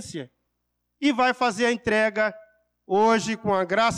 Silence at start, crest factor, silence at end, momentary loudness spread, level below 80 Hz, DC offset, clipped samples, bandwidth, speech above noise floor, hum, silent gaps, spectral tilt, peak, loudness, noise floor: 0 s; 12 dB; 0 s; 6 LU; -60 dBFS; under 0.1%; under 0.1%; 12.5 kHz; 55 dB; 60 Hz at -50 dBFS; none; -4 dB/octave; -12 dBFS; -23 LUFS; -77 dBFS